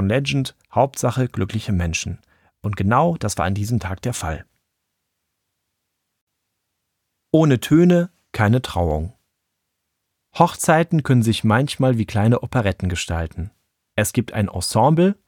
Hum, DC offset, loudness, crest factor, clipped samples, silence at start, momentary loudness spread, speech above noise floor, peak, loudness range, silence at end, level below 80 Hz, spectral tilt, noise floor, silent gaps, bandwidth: none; under 0.1%; -20 LUFS; 20 dB; under 0.1%; 0 s; 12 LU; 58 dB; -2 dBFS; 8 LU; 0.15 s; -40 dBFS; -6 dB/octave; -76 dBFS; 6.21-6.27 s; 18 kHz